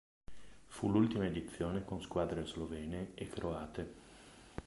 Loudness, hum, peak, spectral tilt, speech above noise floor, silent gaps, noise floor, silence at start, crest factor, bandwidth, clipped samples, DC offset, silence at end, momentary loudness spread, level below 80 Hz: -39 LUFS; none; -20 dBFS; -7 dB/octave; 20 dB; none; -58 dBFS; 0.3 s; 20 dB; 11.5 kHz; under 0.1%; under 0.1%; 0 s; 19 LU; -56 dBFS